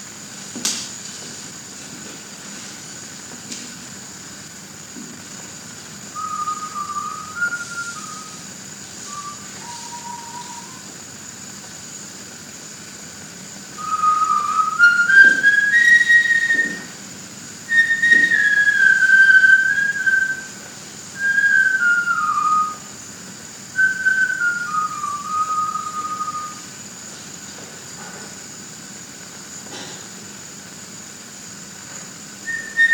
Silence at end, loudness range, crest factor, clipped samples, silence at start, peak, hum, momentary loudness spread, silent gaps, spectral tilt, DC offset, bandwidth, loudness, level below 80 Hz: 0 s; 20 LU; 20 dB; under 0.1%; 0 s; 0 dBFS; none; 22 LU; none; -0.5 dB/octave; under 0.1%; 19 kHz; -15 LUFS; -66 dBFS